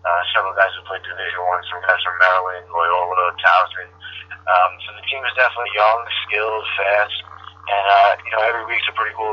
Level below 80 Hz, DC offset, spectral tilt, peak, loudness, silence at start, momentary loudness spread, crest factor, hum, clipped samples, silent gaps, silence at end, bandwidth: -62 dBFS; under 0.1%; -3 dB/octave; 0 dBFS; -18 LUFS; 0.05 s; 14 LU; 18 dB; none; under 0.1%; none; 0 s; 6.6 kHz